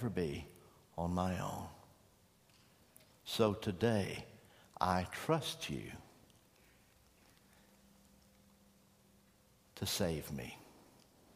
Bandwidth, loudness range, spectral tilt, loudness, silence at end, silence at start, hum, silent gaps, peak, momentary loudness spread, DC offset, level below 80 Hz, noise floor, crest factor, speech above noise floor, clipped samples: 15.5 kHz; 8 LU; -5 dB/octave; -39 LUFS; 0.55 s; 0 s; none; none; -16 dBFS; 22 LU; under 0.1%; -64 dBFS; -69 dBFS; 26 dB; 31 dB; under 0.1%